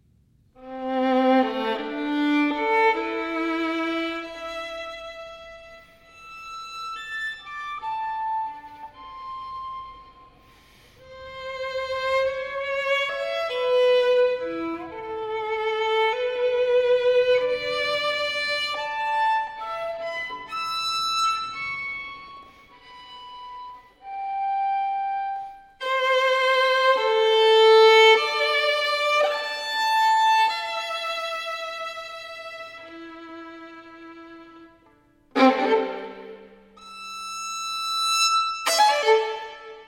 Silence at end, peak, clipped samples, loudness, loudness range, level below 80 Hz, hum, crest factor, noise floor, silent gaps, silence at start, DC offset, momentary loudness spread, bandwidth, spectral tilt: 0.05 s; -4 dBFS; under 0.1%; -23 LUFS; 16 LU; -62 dBFS; none; 20 dB; -60 dBFS; none; 0.6 s; under 0.1%; 21 LU; 16.5 kHz; -1.5 dB/octave